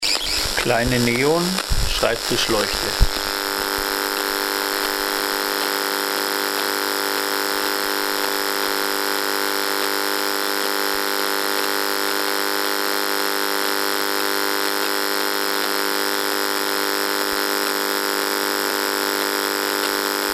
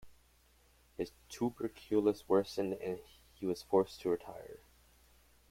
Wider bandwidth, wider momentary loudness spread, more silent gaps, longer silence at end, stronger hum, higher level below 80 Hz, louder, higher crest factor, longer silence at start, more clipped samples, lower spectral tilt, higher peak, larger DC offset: about the same, 16 kHz vs 16.5 kHz; second, 2 LU vs 17 LU; neither; second, 0 s vs 0.95 s; first, 50 Hz at -50 dBFS vs none; first, -34 dBFS vs -66 dBFS; first, -20 LUFS vs -36 LUFS; about the same, 20 dB vs 22 dB; about the same, 0 s vs 0.05 s; neither; second, -2 dB/octave vs -6 dB/octave; first, 0 dBFS vs -16 dBFS; neither